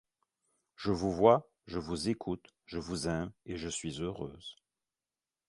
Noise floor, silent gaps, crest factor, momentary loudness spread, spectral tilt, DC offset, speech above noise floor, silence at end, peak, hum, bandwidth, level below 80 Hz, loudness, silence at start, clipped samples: under -90 dBFS; none; 26 dB; 17 LU; -5.5 dB/octave; under 0.1%; over 57 dB; 0.95 s; -10 dBFS; none; 11.5 kHz; -56 dBFS; -34 LUFS; 0.8 s; under 0.1%